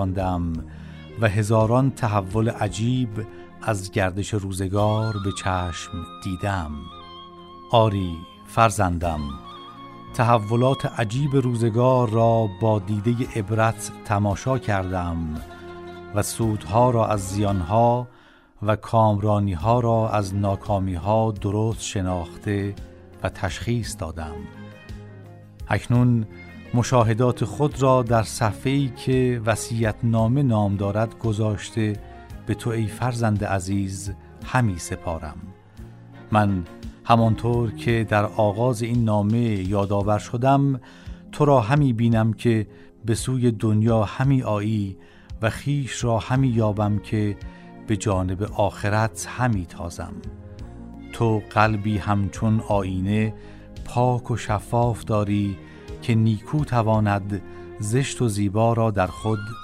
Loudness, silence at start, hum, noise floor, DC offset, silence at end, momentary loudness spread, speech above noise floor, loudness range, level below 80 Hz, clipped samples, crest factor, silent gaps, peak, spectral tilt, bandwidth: -23 LUFS; 0 s; none; -43 dBFS; under 0.1%; 0 s; 18 LU; 21 dB; 5 LU; -42 dBFS; under 0.1%; 20 dB; none; -4 dBFS; -6.5 dB/octave; 13.5 kHz